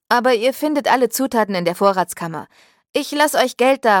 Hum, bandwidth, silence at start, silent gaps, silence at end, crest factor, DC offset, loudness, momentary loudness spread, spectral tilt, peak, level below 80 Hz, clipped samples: none; 17.5 kHz; 0.1 s; 2.89-2.94 s; 0 s; 16 dB; under 0.1%; -17 LUFS; 9 LU; -3.5 dB/octave; -2 dBFS; -64 dBFS; under 0.1%